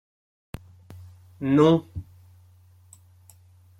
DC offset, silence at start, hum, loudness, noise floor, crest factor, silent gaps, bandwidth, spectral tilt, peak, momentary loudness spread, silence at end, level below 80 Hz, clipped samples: under 0.1%; 0.9 s; none; -21 LUFS; -54 dBFS; 20 dB; none; 14 kHz; -8 dB/octave; -6 dBFS; 28 LU; 1.75 s; -56 dBFS; under 0.1%